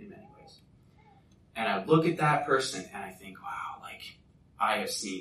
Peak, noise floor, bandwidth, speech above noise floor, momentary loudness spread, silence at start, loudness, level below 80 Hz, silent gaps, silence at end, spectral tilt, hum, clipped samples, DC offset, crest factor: -10 dBFS; -60 dBFS; 14.5 kHz; 30 dB; 19 LU; 0 s; -29 LUFS; -68 dBFS; none; 0 s; -4.5 dB/octave; none; under 0.1%; under 0.1%; 22 dB